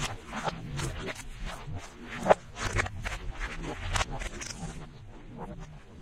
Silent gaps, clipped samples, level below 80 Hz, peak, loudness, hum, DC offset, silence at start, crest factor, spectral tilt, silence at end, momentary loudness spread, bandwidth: none; under 0.1%; -42 dBFS; -6 dBFS; -34 LUFS; none; under 0.1%; 0 s; 28 dB; -4 dB/octave; 0 s; 18 LU; 15.5 kHz